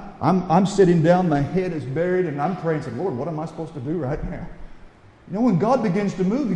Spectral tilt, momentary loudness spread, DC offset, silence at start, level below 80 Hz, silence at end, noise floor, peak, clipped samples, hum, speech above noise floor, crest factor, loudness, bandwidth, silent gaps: -8 dB/octave; 13 LU; under 0.1%; 0 s; -44 dBFS; 0 s; -46 dBFS; -4 dBFS; under 0.1%; none; 25 dB; 16 dB; -21 LUFS; 9.4 kHz; none